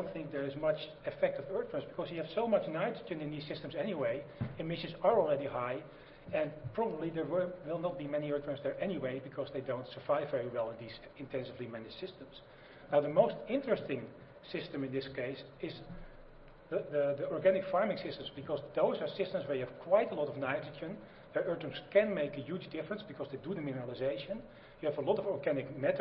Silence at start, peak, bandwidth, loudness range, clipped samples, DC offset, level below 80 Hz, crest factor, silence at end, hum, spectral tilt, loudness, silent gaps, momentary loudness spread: 0 s; -14 dBFS; 5.6 kHz; 4 LU; under 0.1%; under 0.1%; -64 dBFS; 22 dB; 0 s; none; -5 dB/octave; -36 LUFS; none; 13 LU